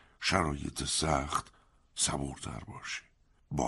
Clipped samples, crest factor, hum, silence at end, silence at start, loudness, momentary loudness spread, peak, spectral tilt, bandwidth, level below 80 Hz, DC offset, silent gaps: under 0.1%; 24 dB; none; 0 s; 0.2 s; -33 LUFS; 13 LU; -10 dBFS; -3 dB/octave; 11.5 kHz; -48 dBFS; under 0.1%; none